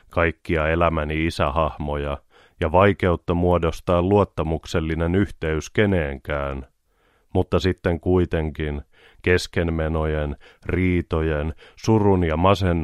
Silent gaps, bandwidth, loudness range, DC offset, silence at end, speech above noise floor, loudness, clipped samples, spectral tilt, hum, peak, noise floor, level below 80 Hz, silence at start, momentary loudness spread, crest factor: none; 12.5 kHz; 3 LU; under 0.1%; 0 s; 42 dB; -22 LUFS; under 0.1%; -7 dB/octave; none; -4 dBFS; -63 dBFS; -34 dBFS; 0.1 s; 10 LU; 18 dB